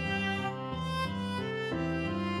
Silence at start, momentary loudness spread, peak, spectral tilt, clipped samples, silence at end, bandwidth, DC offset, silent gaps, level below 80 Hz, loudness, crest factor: 0 s; 3 LU; -20 dBFS; -6 dB/octave; under 0.1%; 0 s; 13 kHz; under 0.1%; none; -52 dBFS; -33 LUFS; 12 dB